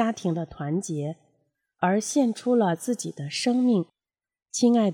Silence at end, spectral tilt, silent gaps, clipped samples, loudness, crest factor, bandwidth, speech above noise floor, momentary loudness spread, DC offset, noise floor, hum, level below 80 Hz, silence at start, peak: 0 s; -5.5 dB/octave; none; under 0.1%; -25 LUFS; 16 dB; 14.5 kHz; 48 dB; 10 LU; under 0.1%; -72 dBFS; none; -66 dBFS; 0 s; -10 dBFS